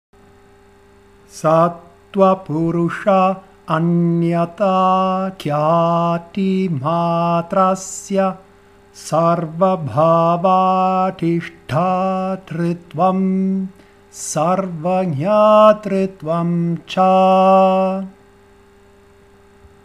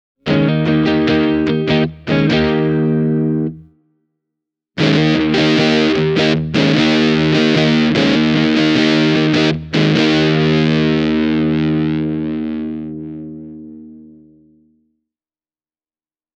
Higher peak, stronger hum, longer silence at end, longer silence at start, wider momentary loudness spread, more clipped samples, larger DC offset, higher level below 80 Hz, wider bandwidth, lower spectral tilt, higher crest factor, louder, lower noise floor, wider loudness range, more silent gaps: about the same, 0 dBFS vs 0 dBFS; neither; second, 1.75 s vs 2.35 s; first, 1.35 s vs 0.25 s; about the same, 10 LU vs 10 LU; neither; neither; second, -56 dBFS vs -42 dBFS; first, 13 kHz vs 8.2 kHz; about the same, -7 dB/octave vs -6.5 dB/octave; about the same, 16 dB vs 16 dB; about the same, -16 LUFS vs -14 LUFS; second, -48 dBFS vs under -90 dBFS; second, 5 LU vs 9 LU; neither